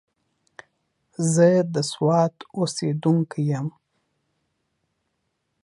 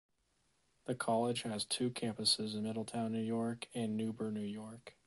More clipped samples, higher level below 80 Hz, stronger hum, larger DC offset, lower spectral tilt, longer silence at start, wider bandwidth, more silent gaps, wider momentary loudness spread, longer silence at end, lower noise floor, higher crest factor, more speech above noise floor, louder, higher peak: neither; first, -70 dBFS vs -76 dBFS; neither; neither; first, -6 dB/octave vs -4 dB/octave; first, 1.2 s vs 0.85 s; about the same, 11.5 kHz vs 11.5 kHz; neither; about the same, 10 LU vs 11 LU; first, 1.95 s vs 0.15 s; about the same, -75 dBFS vs -78 dBFS; about the same, 20 dB vs 20 dB; first, 54 dB vs 40 dB; first, -22 LUFS vs -37 LUFS; first, -4 dBFS vs -18 dBFS